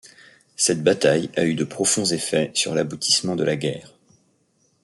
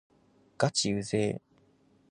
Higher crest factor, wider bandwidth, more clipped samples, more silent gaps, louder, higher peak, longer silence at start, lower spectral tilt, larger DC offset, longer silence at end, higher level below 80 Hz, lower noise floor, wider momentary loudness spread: about the same, 20 dB vs 24 dB; first, 12 kHz vs 10.5 kHz; neither; neither; first, -21 LUFS vs -30 LUFS; first, -4 dBFS vs -10 dBFS; second, 0.05 s vs 0.6 s; about the same, -3 dB/octave vs -4 dB/octave; neither; first, 0.95 s vs 0.7 s; about the same, -64 dBFS vs -62 dBFS; about the same, -65 dBFS vs -65 dBFS; about the same, 6 LU vs 6 LU